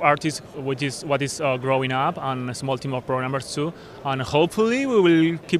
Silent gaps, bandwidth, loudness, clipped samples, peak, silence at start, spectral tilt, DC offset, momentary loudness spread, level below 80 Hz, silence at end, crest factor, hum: none; 14.5 kHz; -23 LUFS; under 0.1%; -2 dBFS; 0 s; -5.5 dB/octave; under 0.1%; 10 LU; -56 dBFS; 0 s; 20 dB; none